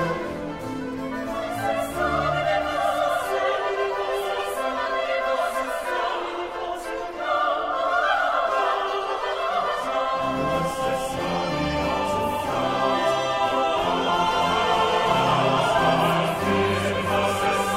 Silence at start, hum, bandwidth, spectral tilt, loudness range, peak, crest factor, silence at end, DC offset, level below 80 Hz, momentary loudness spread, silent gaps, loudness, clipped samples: 0 s; none; 16 kHz; -4.5 dB/octave; 5 LU; -8 dBFS; 16 dB; 0 s; under 0.1%; -48 dBFS; 9 LU; none; -24 LUFS; under 0.1%